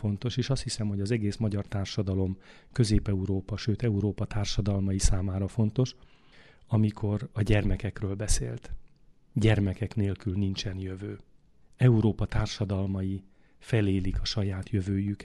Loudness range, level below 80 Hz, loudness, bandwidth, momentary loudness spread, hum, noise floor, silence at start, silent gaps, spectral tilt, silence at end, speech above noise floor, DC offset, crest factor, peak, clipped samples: 2 LU; -38 dBFS; -29 LUFS; 12 kHz; 9 LU; none; -60 dBFS; 0 s; none; -6 dB/octave; 0 s; 32 dB; under 0.1%; 20 dB; -8 dBFS; under 0.1%